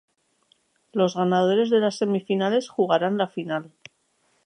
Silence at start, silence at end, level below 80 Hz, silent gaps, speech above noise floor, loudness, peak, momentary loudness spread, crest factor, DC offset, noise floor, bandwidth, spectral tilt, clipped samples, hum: 0.95 s; 0.85 s; -76 dBFS; none; 45 dB; -23 LUFS; -6 dBFS; 10 LU; 18 dB; under 0.1%; -68 dBFS; 10.5 kHz; -6 dB/octave; under 0.1%; none